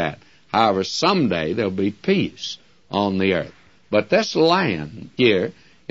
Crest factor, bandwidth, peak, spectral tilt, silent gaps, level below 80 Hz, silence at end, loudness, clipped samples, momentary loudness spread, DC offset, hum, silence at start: 18 dB; 7.8 kHz; -2 dBFS; -5.5 dB/octave; none; -56 dBFS; 0.4 s; -20 LUFS; under 0.1%; 13 LU; 0.2%; none; 0 s